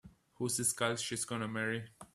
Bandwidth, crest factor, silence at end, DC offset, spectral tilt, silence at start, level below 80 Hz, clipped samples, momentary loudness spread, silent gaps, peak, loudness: 15 kHz; 22 dB; 0.1 s; under 0.1%; -3 dB/octave; 0.05 s; -70 dBFS; under 0.1%; 7 LU; none; -16 dBFS; -35 LUFS